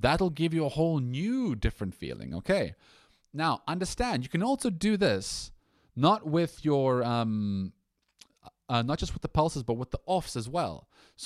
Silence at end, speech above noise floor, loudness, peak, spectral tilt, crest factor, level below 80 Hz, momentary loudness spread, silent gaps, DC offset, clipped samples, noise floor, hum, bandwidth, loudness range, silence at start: 0 s; 33 dB; -30 LUFS; -10 dBFS; -6 dB/octave; 20 dB; -46 dBFS; 11 LU; none; under 0.1%; under 0.1%; -62 dBFS; none; 14 kHz; 4 LU; 0 s